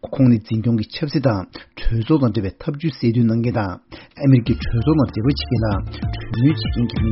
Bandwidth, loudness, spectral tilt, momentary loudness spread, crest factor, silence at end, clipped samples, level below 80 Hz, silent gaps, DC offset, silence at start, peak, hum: 6 kHz; -19 LUFS; -7.5 dB/octave; 10 LU; 16 dB; 0 s; under 0.1%; -32 dBFS; none; under 0.1%; 0.05 s; -2 dBFS; none